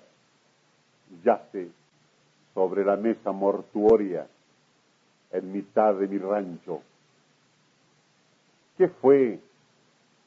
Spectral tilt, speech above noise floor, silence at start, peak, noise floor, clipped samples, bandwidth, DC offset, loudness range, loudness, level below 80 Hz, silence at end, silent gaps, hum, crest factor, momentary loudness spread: -8.5 dB/octave; 41 dB; 1.1 s; -8 dBFS; -65 dBFS; under 0.1%; 7.2 kHz; under 0.1%; 4 LU; -25 LUFS; -64 dBFS; 0.9 s; none; none; 20 dB; 17 LU